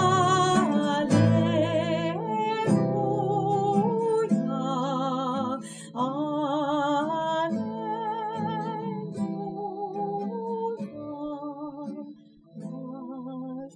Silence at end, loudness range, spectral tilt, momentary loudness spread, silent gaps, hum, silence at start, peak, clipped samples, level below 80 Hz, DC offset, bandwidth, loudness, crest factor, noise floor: 0.05 s; 10 LU; -6.5 dB/octave; 15 LU; none; none; 0 s; -10 dBFS; under 0.1%; -66 dBFS; under 0.1%; 11 kHz; -27 LUFS; 18 dB; -48 dBFS